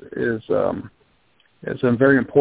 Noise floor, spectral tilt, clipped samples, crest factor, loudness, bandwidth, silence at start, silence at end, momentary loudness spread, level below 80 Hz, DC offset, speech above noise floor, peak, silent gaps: -61 dBFS; -11.5 dB/octave; under 0.1%; 18 dB; -20 LUFS; 4 kHz; 0 s; 0 s; 16 LU; -54 dBFS; under 0.1%; 42 dB; -4 dBFS; none